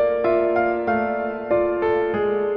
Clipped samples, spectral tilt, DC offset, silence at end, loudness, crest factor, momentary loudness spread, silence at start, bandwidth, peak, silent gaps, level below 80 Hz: under 0.1%; -9 dB/octave; under 0.1%; 0 s; -21 LUFS; 12 dB; 3 LU; 0 s; 5.4 kHz; -8 dBFS; none; -50 dBFS